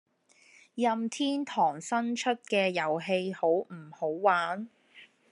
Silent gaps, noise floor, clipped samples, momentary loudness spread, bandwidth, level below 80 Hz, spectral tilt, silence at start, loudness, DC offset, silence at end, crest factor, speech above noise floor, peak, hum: none; -62 dBFS; under 0.1%; 9 LU; 11 kHz; -90 dBFS; -4.5 dB/octave; 0.75 s; -29 LUFS; under 0.1%; 0.25 s; 20 dB; 33 dB; -10 dBFS; none